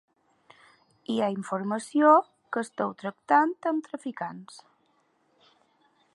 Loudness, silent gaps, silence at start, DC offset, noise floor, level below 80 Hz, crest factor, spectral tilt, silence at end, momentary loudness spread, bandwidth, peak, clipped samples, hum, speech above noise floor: -27 LUFS; none; 1.1 s; under 0.1%; -69 dBFS; -82 dBFS; 22 dB; -5.5 dB/octave; 1.55 s; 17 LU; 11.5 kHz; -6 dBFS; under 0.1%; none; 43 dB